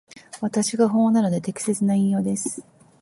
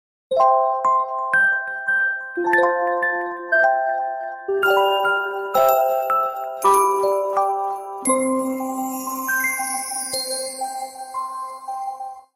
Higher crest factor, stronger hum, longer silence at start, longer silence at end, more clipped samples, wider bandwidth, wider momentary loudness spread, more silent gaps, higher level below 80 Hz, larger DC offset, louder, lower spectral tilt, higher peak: about the same, 16 dB vs 16 dB; neither; about the same, 0.35 s vs 0.3 s; first, 0.4 s vs 0.15 s; neither; second, 11.5 kHz vs 16 kHz; about the same, 11 LU vs 12 LU; neither; about the same, -66 dBFS vs -68 dBFS; neither; about the same, -22 LUFS vs -20 LUFS; first, -6 dB/octave vs -1.5 dB/octave; about the same, -6 dBFS vs -4 dBFS